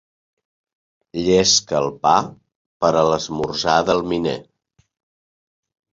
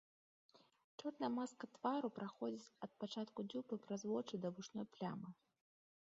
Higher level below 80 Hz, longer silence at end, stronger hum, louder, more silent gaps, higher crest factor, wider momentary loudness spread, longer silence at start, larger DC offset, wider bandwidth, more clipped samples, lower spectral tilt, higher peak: first, -50 dBFS vs -90 dBFS; first, 1.5 s vs 0.7 s; neither; first, -18 LUFS vs -47 LUFS; first, 2.56-2.80 s vs 0.84-0.98 s; about the same, 20 dB vs 20 dB; about the same, 10 LU vs 9 LU; first, 1.15 s vs 0.55 s; neither; about the same, 7.8 kHz vs 7.4 kHz; neither; second, -3.5 dB/octave vs -5.5 dB/octave; first, -2 dBFS vs -28 dBFS